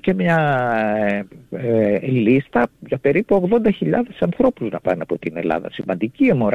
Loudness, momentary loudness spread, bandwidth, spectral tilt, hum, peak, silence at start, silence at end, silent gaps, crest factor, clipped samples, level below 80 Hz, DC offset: -19 LUFS; 7 LU; 8 kHz; -9 dB/octave; none; -4 dBFS; 0.05 s; 0 s; none; 14 dB; under 0.1%; -52 dBFS; under 0.1%